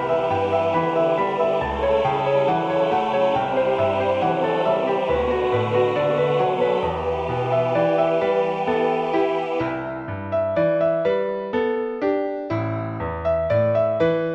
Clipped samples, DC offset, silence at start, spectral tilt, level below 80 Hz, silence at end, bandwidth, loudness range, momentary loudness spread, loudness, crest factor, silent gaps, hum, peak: under 0.1%; under 0.1%; 0 s; -7.5 dB/octave; -46 dBFS; 0 s; 8 kHz; 2 LU; 5 LU; -21 LUFS; 14 dB; none; none; -6 dBFS